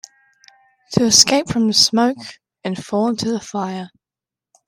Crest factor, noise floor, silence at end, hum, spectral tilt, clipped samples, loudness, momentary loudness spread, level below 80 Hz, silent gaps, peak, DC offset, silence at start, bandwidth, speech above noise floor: 20 dB; -89 dBFS; 0.8 s; none; -3 dB/octave; under 0.1%; -16 LUFS; 20 LU; -54 dBFS; none; 0 dBFS; under 0.1%; 0.9 s; 15.5 kHz; 72 dB